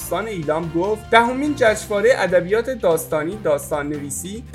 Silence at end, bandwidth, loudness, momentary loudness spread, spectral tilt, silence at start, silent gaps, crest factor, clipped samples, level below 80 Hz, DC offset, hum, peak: 0 s; 16 kHz; -19 LUFS; 9 LU; -4.5 dB/octave; 0 s; none; 20 dB; under 0.1%; -44 dBFS; under 0.1%; none; 0 dBFS